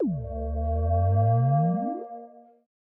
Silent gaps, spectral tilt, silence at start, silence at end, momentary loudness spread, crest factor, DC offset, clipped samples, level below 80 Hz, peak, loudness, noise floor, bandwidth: none; -15 dB/octave; 0 s; 0.55 s; 14 LU; 12 dB; under 0.1%; under 0.1%; -38 dBFS; -14 dBFS; -26 LUFS; -47 dBFS; 2.2 kHz